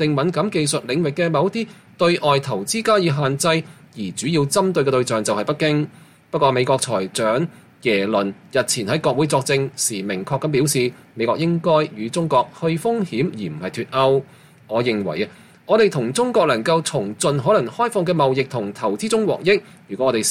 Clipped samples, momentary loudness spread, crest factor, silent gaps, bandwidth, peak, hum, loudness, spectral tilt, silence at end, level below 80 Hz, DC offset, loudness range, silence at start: under 0.1%; 8 LU; 16 dB; none; 16 kHz; -4 dBFS; none; -20 LUFS; -4.5 dB/octave; 0 s; -60 dBFS; under 0.1%; 2 LU; 0 s